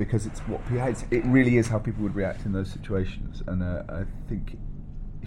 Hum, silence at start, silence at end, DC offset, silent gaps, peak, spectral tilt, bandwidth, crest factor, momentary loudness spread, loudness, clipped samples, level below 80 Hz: none; 0 s; 0 s; under 0.1%; none; -8 dBFS; -7.5 dB/octave; 11.5 kHz; 18 dB; 16 LU; -27 LUFS; under 0.1%; -36 dBFS